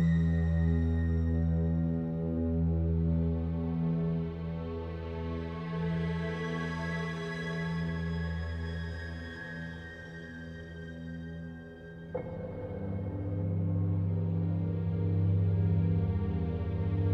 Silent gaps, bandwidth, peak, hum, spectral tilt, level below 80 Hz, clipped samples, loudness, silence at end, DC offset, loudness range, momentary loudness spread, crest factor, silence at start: none; 6.2 kHz; -18 dBFS; none; -9 dB/octave; -42 dBFS; under 0.1%; -33 LUFS; 0 s; under 0.1%; 11 LU; 13 LU; 14 dB; 0 s